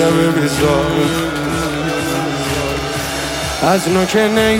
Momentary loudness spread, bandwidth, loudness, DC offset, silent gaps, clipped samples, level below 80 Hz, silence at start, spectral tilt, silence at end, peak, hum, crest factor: 6 LU; 16.5 kHz; -16 LUFS; under 0.1%; none; under 0.1%; -34 dBFS; 0 s; -4.5 dB/octave; 0 s; -2 dBFS; none; 14 dB